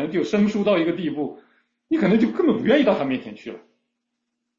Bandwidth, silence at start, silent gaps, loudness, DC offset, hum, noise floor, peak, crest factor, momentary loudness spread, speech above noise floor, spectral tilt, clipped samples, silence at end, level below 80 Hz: 7.6 kHz; 0 s; none; -21 LUFS; under 0.1%; none; -78 dBFS; -6 dBFS; 16 dB; 13 LU; 58 dB; -7 dB/octave; under 0.1%; 1 s; -62 dBFS